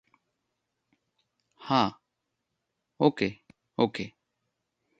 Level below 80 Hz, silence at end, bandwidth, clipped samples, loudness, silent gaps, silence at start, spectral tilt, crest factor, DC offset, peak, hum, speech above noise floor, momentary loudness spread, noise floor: -68 dBFS; 0.9 s; 9 kHz; under 0.1%; -28 LUFS; none; 1.6 s; -6.5 dB/octave; 26 dB; under 0.1%; -6 dBFS; none; 57 dB; 15 LU; -83 dBFS